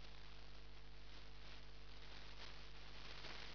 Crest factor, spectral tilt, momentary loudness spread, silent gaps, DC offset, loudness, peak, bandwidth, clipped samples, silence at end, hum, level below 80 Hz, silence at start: 18 dB; -2 dB/octave; 7 LU; none; 0.3%; -58 LUFS; -38 dBFS; 5.4 kHz; under 0.1%; 0 s; 50 Hz at -60 dBFS; -62 dBFS; 0 s